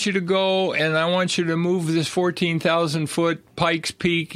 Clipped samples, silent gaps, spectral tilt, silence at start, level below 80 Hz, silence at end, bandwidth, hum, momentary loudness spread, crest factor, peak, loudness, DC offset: under 0.1%; none; -5 dB/octave; 0 s; -58 dBFS; 0 s; 14.5 kHz; none; 3 LU; 18 dB; -4 dBFS; -21 LUFS; under 0.1%